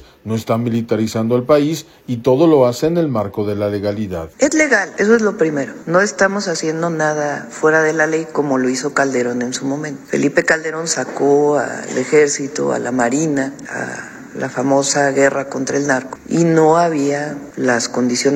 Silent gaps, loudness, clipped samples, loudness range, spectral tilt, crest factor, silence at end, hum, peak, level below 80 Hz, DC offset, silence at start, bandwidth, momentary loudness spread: none; -16 LUFS; under 0.1%; 2 LU; -4.5 dB/octave; 16 dB; 0 s; none; 0 dBFS; -54 dBFS; under 0.1%; 0 s; 16 kHz; 9 LU